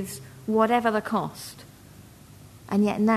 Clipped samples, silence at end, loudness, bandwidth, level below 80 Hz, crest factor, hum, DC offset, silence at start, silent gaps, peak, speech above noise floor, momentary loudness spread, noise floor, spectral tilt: under 0.1%; 0 s; -25 LUFS; 13.5 kHz; -60 dBFS; 18 dB; none; under 0.1%; 0 s; none; -8 dBFS; 24 dB; 18 LU; -49 dBFS; -6 dB/octave